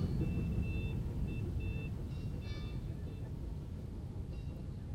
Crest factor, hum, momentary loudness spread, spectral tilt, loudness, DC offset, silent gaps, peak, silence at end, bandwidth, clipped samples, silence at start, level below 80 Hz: 16 dB; none; 8 LU; -8.5 dB/octave; -41 LUFS; under 0.1%; none; -24 dBFS; 0 s; 15.5 kHz; under 0.1%; 0 s; -44 dBFS